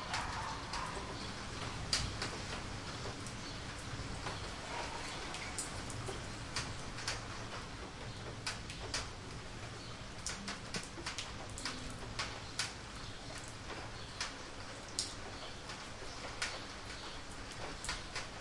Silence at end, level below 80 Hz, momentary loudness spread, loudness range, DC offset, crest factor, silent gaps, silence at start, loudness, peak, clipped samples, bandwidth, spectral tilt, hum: 0 s; -54 dBFS; 6 LU; 3 LU; under 0.1%; 26 dB; none; 0 s; -43 LUFS; -16 dBFS; under 0.1%; 11.5 kHz; -3 dB/octave; none